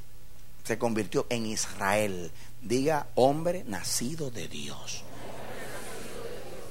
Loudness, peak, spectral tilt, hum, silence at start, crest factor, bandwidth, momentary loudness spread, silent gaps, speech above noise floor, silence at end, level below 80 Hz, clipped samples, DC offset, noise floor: -31 LUFS; -8 dBFS; -4 dB/octave; none; 0 s; 24 dB; 16 kHz; 16 LU; none; 22 dB; 0 s; -54 dBFS; under 0.1%; 2%; -52 dBFS